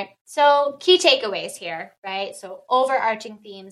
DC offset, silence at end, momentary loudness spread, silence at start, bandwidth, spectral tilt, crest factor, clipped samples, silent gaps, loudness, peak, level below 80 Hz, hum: under 0.1%; 0 s; 17 LU; 0 s; 12.5 kHz; -2 dB/octave; 18 dB; under 0.1%; 0.21-0.25 s, 1.98-2.03 s; -20 LUFS; -2 dBFS; -80 dBFS; none